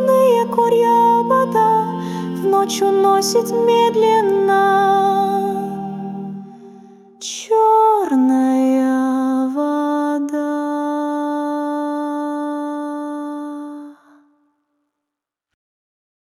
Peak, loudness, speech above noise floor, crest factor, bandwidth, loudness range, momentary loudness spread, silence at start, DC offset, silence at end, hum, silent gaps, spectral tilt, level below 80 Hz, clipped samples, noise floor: -4 dBFS; -17 LUFS; 68 dB; 14 dB; 15.5 kHz; 12 LU; 14 LU; 0 s; under 0.1%; 2.45 s; none; none; -5 dB/octave; -66 dBFS; under 0.1%; -83 dBFS